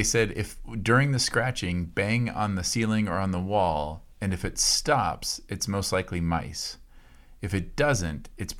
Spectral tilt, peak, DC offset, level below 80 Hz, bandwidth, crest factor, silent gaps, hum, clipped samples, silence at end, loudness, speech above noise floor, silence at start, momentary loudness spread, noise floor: -4 dB/octave; -8 dBFS; under 0.1%; -44 dBFS; 16.5 kHz; 18 dB; none; none; under 0.1%; 0 s; -27 LUFS; 24 dB; 0 s; 12 LU; -50 dBFS